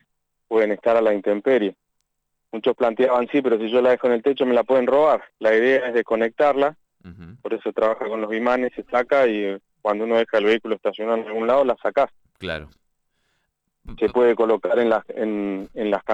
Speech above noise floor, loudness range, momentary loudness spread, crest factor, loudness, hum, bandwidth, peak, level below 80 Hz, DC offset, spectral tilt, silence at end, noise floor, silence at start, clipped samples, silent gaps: 56 dB; 4 LU; 9 LU; 14 dB; -21 LUFS; none; 8 kHz; -8 dBFS; -54 dBFS; under 0.1%; -6.5 dB/octave; 0 s; -76 dBFS; 0.5 s; under 0.1%; none